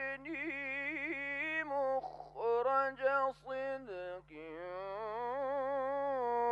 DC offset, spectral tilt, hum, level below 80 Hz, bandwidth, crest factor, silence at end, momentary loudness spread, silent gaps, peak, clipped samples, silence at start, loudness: under 0.1%; -5.5 dB/octave; none; -70 dBFS; 7.6 kHz; 16 dB; 0 s; 12 LU; none; -20 dBFS; under 0.1%; 0 s; -37 LUFS